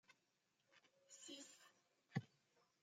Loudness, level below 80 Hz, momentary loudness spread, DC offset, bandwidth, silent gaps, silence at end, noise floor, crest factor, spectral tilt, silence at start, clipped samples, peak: -55 LUFS; under -90 dBFS; 14 LU; under 0.1%; 15.5 kHz; none; 0.2 s; -86 dBFS; 28 dB; -4.5 dB/octave; 0.1 s; under 0.1%; -32 dBFS